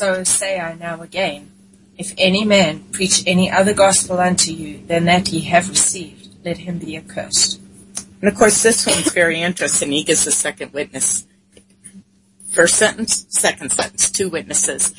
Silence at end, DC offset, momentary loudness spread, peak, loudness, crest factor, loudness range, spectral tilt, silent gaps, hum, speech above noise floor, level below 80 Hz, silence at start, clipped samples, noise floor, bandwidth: 0.05 s; under 0.1%; 15 LU; 0 dBFS; -15 LUFS; 18 dB; 3 LU; -2.5 dB/octave; none; none; 34 dB; -50 dBFS; 0 s; under 0.1%; -51 dBFS; 11.5 kHz